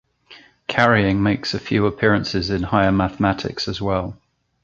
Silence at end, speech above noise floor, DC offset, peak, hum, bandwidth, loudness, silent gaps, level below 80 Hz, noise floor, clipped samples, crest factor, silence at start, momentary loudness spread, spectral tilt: 0.5 s; 29 dB; under 0.1%; -2 dBFS; none; 7.6 kHz; -19 LUFS; none; -40 dBFS; -48 dBFS; under 0.1%; 18 dB; 0.3 s; 8 LU; -6.5 dB/octave